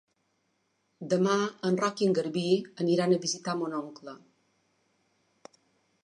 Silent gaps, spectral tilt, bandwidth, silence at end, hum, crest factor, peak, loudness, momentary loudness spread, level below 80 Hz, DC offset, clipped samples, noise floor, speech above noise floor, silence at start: none; -5 dB/octave; 11 kHz; 1.9 s; none; 18 dB; -12 dBFS; -28 LUFS; 16 LU; -80 dBFS; under 0.1%; under 0.1%; -75 dBFS; 47 dB; 1 s